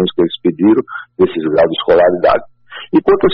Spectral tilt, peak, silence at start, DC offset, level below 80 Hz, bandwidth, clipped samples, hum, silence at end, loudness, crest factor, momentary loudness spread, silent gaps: -10 dB/octave; -2 dBFS; 0 s; under 0.1%; -44 dBFS; 5.4 kHz; under 0.1%; none; 0 s; -13 LUFS; 10 dB; 8 LU; none